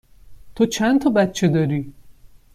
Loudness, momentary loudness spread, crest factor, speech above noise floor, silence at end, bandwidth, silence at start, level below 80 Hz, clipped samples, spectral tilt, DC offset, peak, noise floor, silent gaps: -19 LUFS; 8 LU; 16 dB; 28 dB; 0.45 s; 15 kHz; 0.25 s; -50 dBFS; under 0.1%; -6 dB/octave; under 0.1%; -6 dBFS; -46 dBFS; none